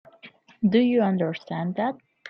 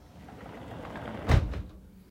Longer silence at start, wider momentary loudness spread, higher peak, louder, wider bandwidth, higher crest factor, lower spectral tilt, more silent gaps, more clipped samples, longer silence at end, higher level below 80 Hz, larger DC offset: first, 0.25 s vs 0 s; second, 10 LU vs 21 LU; about the same, -10 dBFS vs -8 dBFS; first, -24 LUFS vs -31 LUFS; second, 6 kHz vs 15.5 kHz; second, 16 dB vs 24 dB; first, -9 dB/octave vs -7 dB/octave; neither; neither; about the same, 0 s vs 0.1 s; second, -70 dBFS vs -36 dBFS; neither